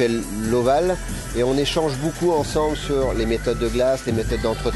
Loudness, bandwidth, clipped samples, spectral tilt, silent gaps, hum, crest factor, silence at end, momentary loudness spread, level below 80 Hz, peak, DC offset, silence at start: -21 LUFS; 12.5 kHz; under 0.1%; -5.5 dB/octave; none; none; 14 dB; 0 s; 4 LU; -32 dBFS; -6 dBFS; under 0.1%; 0 s